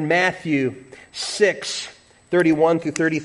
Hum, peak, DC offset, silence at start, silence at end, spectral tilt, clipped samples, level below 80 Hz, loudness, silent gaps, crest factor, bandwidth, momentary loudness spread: none; -4 dBFS; under 0.1%; 0 s; 0 s; -4.5 dB/octave; under 0.1%; -62 dBFS; -20 LUFS; none; 16 dB; 11.5 kHz; 14 LU